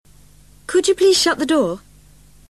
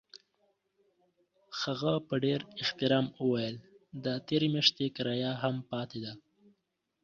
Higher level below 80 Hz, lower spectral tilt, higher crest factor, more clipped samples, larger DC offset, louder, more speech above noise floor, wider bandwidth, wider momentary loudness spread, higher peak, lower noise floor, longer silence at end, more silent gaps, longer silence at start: first, -50 dBFS vs -72 dBFS; second, -2.5 dB/octave vs -5.5 dB/octave; second, 14 dB vs 24 dB; neither; first, 0.2% vs under 0.1%; first, -16 LUFS vs -32 LUFS; second, 32 dB vs 49 dB; first, 13 kHz vs 7.4 kHz; about the same, 15 LU vs 15 LU; first, -4 dBFS vs -10 dBFS; second, -49 dBFS vs -81 dBFS; second, 0.7 s vs 0.85 s; neither; first, 0.7 s vs 0.15 s